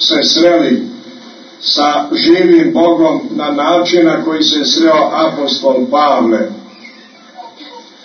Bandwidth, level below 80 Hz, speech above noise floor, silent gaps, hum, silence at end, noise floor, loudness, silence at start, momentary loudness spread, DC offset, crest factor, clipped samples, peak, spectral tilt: 6.6 kHz; -62 dBFS; 28 dB; none; none; 0.25 s; -38 dBFS; -11 LUFS; 0 s; 9 LU; under 0.1%; 12 dB; under 0.1%; 0 dBFS; -3.5 dB/octave